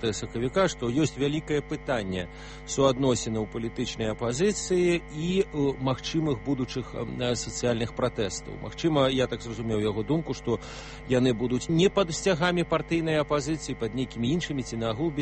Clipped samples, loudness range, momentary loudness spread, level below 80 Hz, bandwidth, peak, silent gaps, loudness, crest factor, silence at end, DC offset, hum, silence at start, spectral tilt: under 0.1%; 3 LU; 8 LU; -46 dBFS; 8.8 kHz; -10 dBFS; none; -27 LUFS; 18 dB; 0 s; under 0.1%; none; 0 s; -5 dB/octave